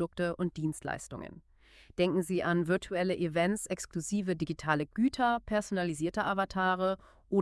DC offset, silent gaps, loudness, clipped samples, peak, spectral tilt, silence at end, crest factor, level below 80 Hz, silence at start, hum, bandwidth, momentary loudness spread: under 0.1%; none; -32 LUFS; under 0.1%; -12 dBFS; -5.5 dB/octave; 0 s; 20 dB; -58 dBFS; 0 s; none; 12 kHz; 9 LU